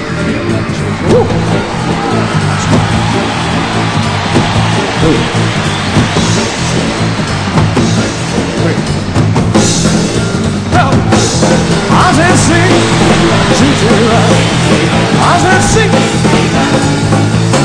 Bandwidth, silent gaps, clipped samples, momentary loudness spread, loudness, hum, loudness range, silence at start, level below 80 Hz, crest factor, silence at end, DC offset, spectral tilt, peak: 10.5 kHz; none; 0.3%; 6 LU; -10 LUFS; none; 4 LU; 0 s; -28 dBFS; 10 dB; 0 s; under 0.1%; -5 dB/octave; 0 dBFS